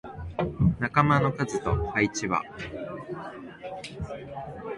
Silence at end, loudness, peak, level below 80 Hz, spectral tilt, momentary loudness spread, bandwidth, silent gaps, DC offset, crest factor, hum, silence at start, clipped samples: 0 s; -28 LUFS; -6 dBFS; -44 dBFS; -6 dB/octave; 16 LU; 11.5 kHz; none; under 0.1%; 22 dB; none; 0.05 s; under 0.1%